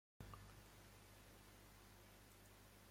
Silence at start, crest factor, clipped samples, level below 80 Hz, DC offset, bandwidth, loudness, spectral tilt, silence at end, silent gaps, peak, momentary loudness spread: 0.2 s; 22 dB; under 0.1%; -70 dBFS; under 0.1%; 16.5 kHz; -64 LUFS; -4 dB/octave; 0 s; none; -42 dBFS; 5 LU